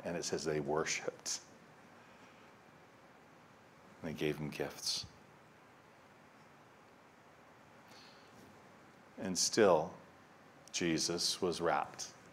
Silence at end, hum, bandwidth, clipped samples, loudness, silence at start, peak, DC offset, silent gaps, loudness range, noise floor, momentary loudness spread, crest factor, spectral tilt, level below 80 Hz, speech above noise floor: 0 s; none; 16 kHz; under 0.1%; -36 LUFS; 0 s; -16 dBFS; under 0.1%; none; 25 LU; -62 dBFS; 27 LU; 24 dB; -3 dB/octave; -72 dBFS; 26 dB